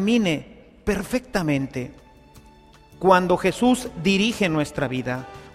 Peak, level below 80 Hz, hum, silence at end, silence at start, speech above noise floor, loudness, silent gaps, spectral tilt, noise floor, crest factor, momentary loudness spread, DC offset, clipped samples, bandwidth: -2 dBFS; -46 dBFS; none; 0.05 s; 0 s; 28 dB; -22 LUFS; none; -5.5 dB/octave; -50 dBFS; 20 dB; 12 LU; under 0.1%; under 0.1%; 15 kHz